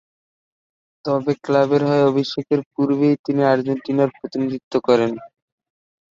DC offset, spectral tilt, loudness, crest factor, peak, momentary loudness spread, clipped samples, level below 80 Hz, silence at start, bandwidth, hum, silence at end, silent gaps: under 0.1%; -7.5 dB/octave; -19 LUFS; 18 dB; -2 dBFS; 8 LU; under 0.1%; -64 dBFS; 1.05 s; 7.6 kHz; none; 0.85 s; 2.66-2.71 s, 3.19-3.24 s, 4.63-4.71 s